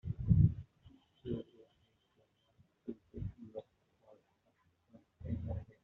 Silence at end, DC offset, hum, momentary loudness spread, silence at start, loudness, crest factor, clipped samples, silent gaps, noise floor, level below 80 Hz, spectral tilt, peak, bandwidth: 0.2 s; under 0.1%; none; 22 LU; 0.05 s; -37 LUFS; 24 dB; under 0.1%; none; -76 dBFS; -52 dBFS; -11.5 dB/octave; -16 dBFS; 3.9 kHz